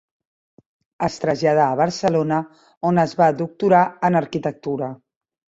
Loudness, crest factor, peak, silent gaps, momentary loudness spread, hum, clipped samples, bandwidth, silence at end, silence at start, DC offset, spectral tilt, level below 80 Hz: -20 LUFS; 18 dB; -2 dBFS; 2.77-2.81 s; 10 LU; none; under 0.1%; 8 kHz; 0.65 s; 1 s; under 0.1%; -6.5 dB/octave; -58 dBFS